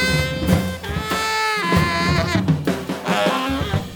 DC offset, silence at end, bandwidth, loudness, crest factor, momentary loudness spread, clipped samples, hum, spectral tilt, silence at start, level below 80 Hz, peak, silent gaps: under 0.1%; 0 s; over 20 kHz; -20 LUFS; 18 dB; 5 LU; under 0.1%; none; -5 dB/octave; 0 s; -36 dBFS; -2 dBFS; none